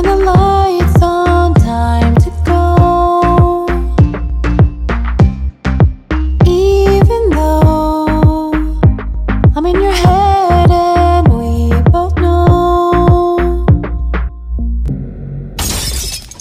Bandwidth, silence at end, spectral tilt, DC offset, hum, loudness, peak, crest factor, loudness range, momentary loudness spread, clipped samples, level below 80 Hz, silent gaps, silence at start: 16 kHz; 0.1 s; -7 dB/octave; under 0.1%; none; -11 LUFS; 0 dBFS; 10 dB; 3 LU; 9 LU; under 0.1%; -16 dBFS; none; 0 s